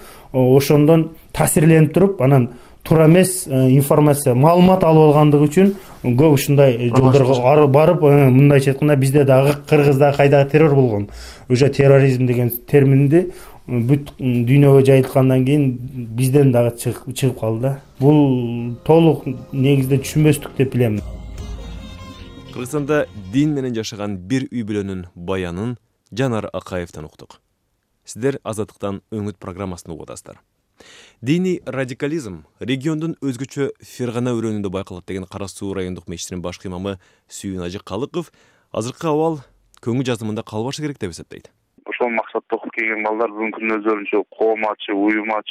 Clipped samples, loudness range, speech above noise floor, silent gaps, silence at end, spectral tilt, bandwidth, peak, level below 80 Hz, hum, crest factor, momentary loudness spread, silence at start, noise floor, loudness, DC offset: under 0.1%; 13 LU; 52 dB; none; 0 s; -7 dB/octave; 16 kHz; 0 dBFS; -44 dBFS; none; 16 dB; 17 LU; 0 s; -68 dBFS; -16 LUFS; under 0.1%